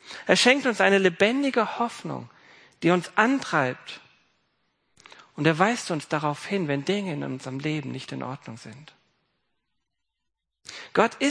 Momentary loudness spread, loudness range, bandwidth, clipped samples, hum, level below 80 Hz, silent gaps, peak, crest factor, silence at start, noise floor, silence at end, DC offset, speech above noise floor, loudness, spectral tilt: 19 LU; 13 LU; 10.5 kHz; under 0.1%; none; -74 dBFS; none; -2 dBFS; 24 dB; 0.05 s; -83 dBFS; 0 s; under 0.1%; 58 dB; -24 LUFS; -4.5 dB/octave